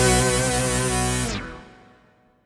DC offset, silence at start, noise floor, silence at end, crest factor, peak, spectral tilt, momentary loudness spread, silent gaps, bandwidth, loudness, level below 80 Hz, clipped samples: under 0.1%; 0 s; -58 dBFS; 0.75 s; 20 dB; -4 dBFS; -3.5 dB/octave; 16 LU; none; 15 kHz; -22 LUFS; -34 dBFS; under 0.1%